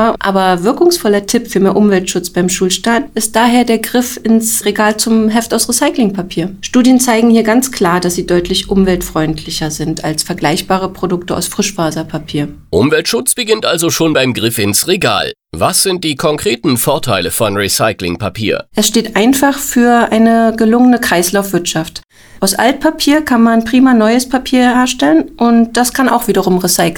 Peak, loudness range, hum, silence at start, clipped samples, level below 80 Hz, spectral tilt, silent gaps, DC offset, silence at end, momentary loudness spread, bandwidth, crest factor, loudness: 0 dBFS; 4 LU; none; 0 s; under 0.1%; -38 dBFS; -4 dB/octave; none; under 0.1%; 0 s; 8 LU; over 20 kHz; 12 dB; -12 LUFS